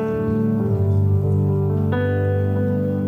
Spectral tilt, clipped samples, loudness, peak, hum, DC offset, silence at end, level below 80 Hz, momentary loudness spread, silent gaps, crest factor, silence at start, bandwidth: -10.5 dB/octave; under 0.1%; -20 LUFS; -10 dBFS; 50 Hz at -40 dBFS; under 0.1%; 0 s; -46 dBFS; 2 LU; none; 10 dB; 0 s; 3.5 kHz